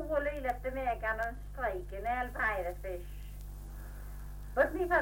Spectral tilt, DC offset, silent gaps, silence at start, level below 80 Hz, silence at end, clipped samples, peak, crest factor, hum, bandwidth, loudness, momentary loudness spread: -6.5 dB/octave; under 0.1%; none; 0 s; -44 dBFS; 0 s; under 0.1%; -16 dBFS; 20 dB; 50 Hz at -45 dBFS; 17 kHz; -35 LUFS; 16 LU